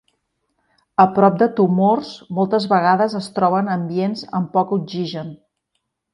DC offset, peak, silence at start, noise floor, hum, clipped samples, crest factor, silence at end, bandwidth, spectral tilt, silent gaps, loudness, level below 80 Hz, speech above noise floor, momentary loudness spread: under 0.1%; 0 dBFS; 1 s; -74 dBFS; none; under 0.1%; 18 dB; 0.8 s; 11 kHz; -7.5 dB/octave; none; -18 LUFS; -64 dBFS; 57 dB; 11 LU